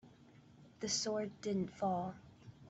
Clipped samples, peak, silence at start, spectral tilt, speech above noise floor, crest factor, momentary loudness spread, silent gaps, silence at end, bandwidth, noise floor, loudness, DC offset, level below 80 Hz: under 0.1%; -24 dBFS; 0.05 s; -4 dB/octave; 24 dB; 18 dB; 14 LU; none; 0 s; 8.2 kHz; -62 dBFS; -39 LUFS; under 0.1%; -74 dBFS